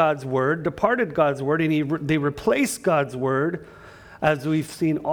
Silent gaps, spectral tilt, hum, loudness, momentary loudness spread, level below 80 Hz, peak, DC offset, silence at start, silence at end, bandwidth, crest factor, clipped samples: none; -6 dB/octave; none; -23 LUFS; 3 LU; -54 dBFS; -4 dBFS; under 0.1%; 0 s; 0 s; over 20 kHz; 18 dB; under 0.1%